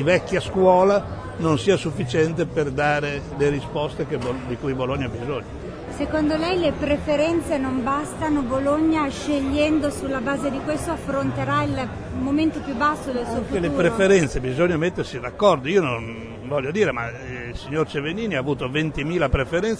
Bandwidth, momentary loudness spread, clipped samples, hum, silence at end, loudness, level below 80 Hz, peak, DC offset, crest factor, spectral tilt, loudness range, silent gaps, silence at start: 11 kHz; 9 LU; under 0.1%; none; 0 s; -22 LUFS; -40 dBFS; -4 dBFS; under 0.1%; 18 dB; -6 dB/octave; 4 LU; none; 0 s